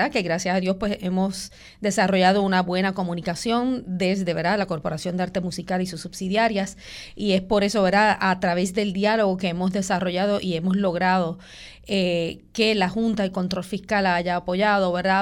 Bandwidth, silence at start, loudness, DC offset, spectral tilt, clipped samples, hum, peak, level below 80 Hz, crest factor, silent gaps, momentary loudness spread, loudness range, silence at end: 13 kHz; 0 s; -23 LUFS; under 0.1%; -5 dB/octave; under 0.1%; none; -6 dBFS; -50 dBFS; 16 dB; none; 9 LU; 3 LU; 0 s